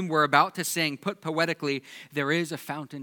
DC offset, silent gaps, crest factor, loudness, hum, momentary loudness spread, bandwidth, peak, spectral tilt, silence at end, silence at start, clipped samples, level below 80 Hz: under 0.1%; none; 24 dB; -27 LUFS; none; 12 LU; 19 kHz; -4 dBFS; -4 dB/octave; 0 s; 0 s; under 0.1%; -84 dBFS